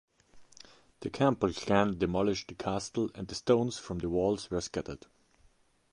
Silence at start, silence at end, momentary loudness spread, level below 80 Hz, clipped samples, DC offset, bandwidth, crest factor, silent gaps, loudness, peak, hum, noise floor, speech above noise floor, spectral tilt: 0.35 s; 0.95 s; 11 LU; -54 dBFS; under 0.1%; under 0.1%; 11 kHz; 22 dB; none; -31 LUFS; -12 dBFS; none; -66 dBFS; 35 dB; -5.5 dB/octave